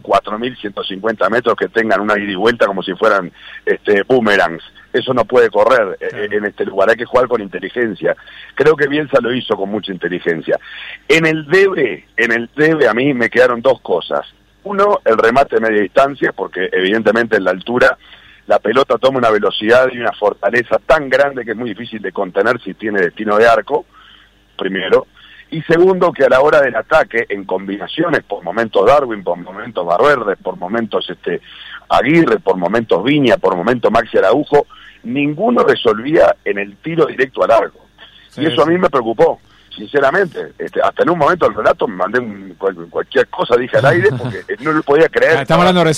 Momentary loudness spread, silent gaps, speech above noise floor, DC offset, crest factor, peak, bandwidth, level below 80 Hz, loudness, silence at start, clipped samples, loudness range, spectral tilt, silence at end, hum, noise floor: 11 LU; none; 32 dB; under 0.1%; 12 dB; -2 dBFS; 12.5 kHz; -46 dBFS; -14 LUFS; 0.05 s; under 0.1%; 3 LU; -6 dB/octave; 0 s; none; -46 dBFS